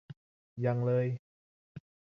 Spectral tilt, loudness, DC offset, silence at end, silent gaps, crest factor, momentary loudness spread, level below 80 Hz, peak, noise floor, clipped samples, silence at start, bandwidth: -10.5 dB/octave; -32 LUFS; under 0.1%; 0.35 s; 0.17-0.56 s, 1.19-1.75 s; 18 dB; 24 LU; -72 dBFS; -18 dBFS; under -90 dBFS; under 0.1%; 0.1 s; 5.2 kHz